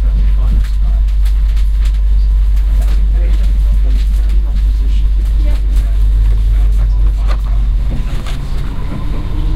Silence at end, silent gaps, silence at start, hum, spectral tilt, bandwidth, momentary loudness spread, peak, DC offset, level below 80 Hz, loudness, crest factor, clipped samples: 0 s; none; 0 s; none; -7 dB/octave; 5 kHz; 7 LU; -2 dBFS; under 0.1%; -10 dBFS; -15 LUFS; 8 dB; under 0.1%